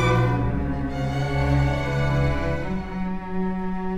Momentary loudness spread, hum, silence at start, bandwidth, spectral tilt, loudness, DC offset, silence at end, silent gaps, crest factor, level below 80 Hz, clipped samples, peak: 7 LU; none; 0 s; 10 kHz; -7.5 dB/octave; -25 LUFS; under 0.1%; 0 s; none; 14 dB; -32 dBFS; under 0.1%; -10 dBFS